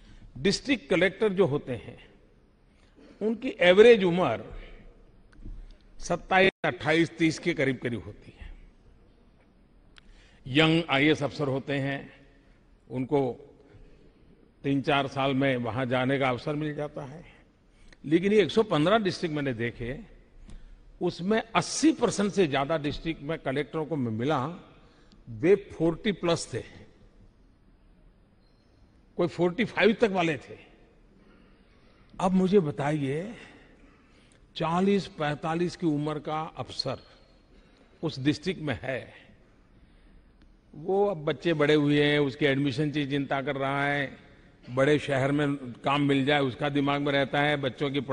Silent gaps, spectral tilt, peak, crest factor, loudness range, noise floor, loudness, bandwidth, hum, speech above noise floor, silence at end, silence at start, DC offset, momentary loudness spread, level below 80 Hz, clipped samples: 6.52-6.63 s; -5.5 dB/octave; -4 dBFS; 24 dB; 8 LU; -61 dBFS; -27 LUFS; 10.5 kHz; none; 34 dB; 0 s; 0.15 s; under 0.1%; 14 LU; -54 dBFS; under 0.1%